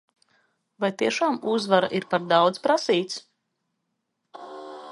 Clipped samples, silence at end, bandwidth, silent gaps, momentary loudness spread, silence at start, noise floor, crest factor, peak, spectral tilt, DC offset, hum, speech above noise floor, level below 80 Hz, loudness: under 0.1%; 0 s; 11.5 kHz; none; 19 LU; 0.8 s; -78 dBFS; 22 dB; -4 dBFS; -4.5 dB/octave; under 0.1%; none; 55 dB; -76 dBFS; -23 LUFS